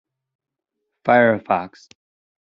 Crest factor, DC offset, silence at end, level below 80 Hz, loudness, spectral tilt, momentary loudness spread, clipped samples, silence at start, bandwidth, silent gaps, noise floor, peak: 20 dB; under 0.1%; 0.75 s; -68 dBFS; -18 LUFS; -4.5 dB/octave; 13 LU; under 0.1%; 1.05 s; 7.2 kHz; none; -80 dBFS; -2 dBFS